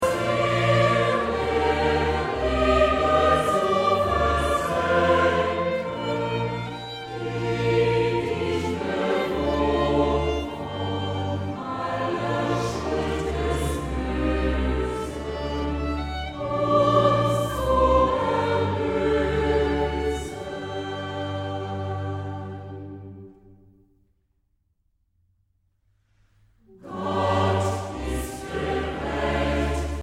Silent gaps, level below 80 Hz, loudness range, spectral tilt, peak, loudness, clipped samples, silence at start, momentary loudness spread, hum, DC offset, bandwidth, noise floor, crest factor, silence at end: none; -36 dBFS; 11 LU; -6 dB/octave; -6 dBFS; -24 LUFS; under 0.1%; 0 s; 11 LU; none; under 0.1%; 16 kHz; -69 dBFS; 18 dB; 0 s